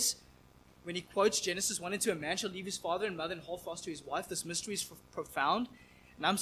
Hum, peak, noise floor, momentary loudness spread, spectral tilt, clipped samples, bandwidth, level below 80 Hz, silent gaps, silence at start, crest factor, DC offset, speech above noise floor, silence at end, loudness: none; -14 dBFS; -61 dBFS; 11 LU; -2 dB/octave; under 0.1%; 16 kHz; -66 dBFS; none; 0 s; 22 dB; under 0.1%; 25 dB; 0 s; -35 LUFS